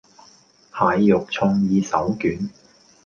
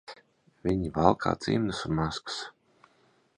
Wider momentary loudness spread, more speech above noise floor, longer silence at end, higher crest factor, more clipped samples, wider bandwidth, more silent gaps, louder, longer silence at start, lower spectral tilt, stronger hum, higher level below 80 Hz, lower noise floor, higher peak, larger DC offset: about the same, 12 LU vs 13 LU; second, 34 dB vs 38 dB; second, 0.55 s vs 0.85 s; second, 18 dB vs 26 dB; neither; second, 7 kHz vs 10.5 kHz; neither; first, -20 LUFS vs -29 LUFS; first, 0.75 s vs 0.1 s; about the same, -7 dB/octave vs -6 dB/octave; neither; about the same, -52 dBFS vs -50 dBFS; second, -53 dBFS vs -66 dBFS; about the same, -2 dBFS vs -4 dBFS; neither